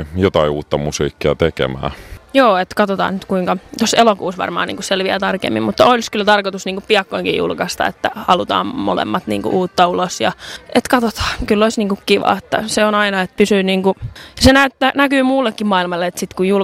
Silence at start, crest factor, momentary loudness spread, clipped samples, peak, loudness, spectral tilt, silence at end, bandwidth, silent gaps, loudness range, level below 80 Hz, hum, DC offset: 0 s; 16 dB; 8 LU; under 0.1%; 0 dBFS; -16 LUFS; -4.5 dB/octave; 0 s; 16 kHz; none; 3 LU; -38 dBFS; none; under 0.1%